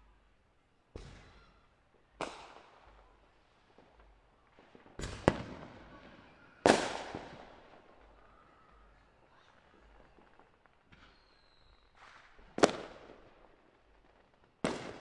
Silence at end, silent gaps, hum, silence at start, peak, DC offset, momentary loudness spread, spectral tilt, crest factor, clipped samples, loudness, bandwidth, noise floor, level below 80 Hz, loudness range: 0 s; none; none; 0.95 s; -2 dBFS; under 0.1%; 29 LU; -4.5 dB/octave; 38 dB; under 0.1%; -34 LUFS; 11.5 kHz; -70 dBFS; -60 dBFS; 17 LU